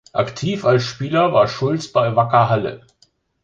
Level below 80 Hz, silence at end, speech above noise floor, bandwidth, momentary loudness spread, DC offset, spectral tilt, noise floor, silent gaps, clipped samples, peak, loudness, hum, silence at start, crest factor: -54 dBFS; 0.65 s; 42 dB; 7.8 kHz; 7 LU; under 0.1%; -6.5 dB/octave; -59 dBFS; none; under 0.1%; -2 dBFS; -18 LUFS; none; 0.15 s; 16 dB